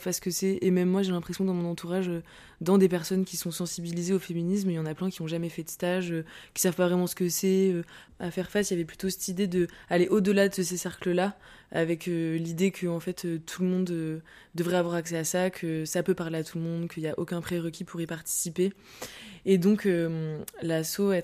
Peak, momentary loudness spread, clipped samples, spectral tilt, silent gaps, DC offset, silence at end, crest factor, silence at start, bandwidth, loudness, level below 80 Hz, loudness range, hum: -10 dBFS; 10 LU; under 0.1%; -5.5 dB/octave; none; under 0.1%; 0 s; 18 dB; 0 s; 15.5 kHz; -29 LUFS; -62 dBFS; 3 LU; none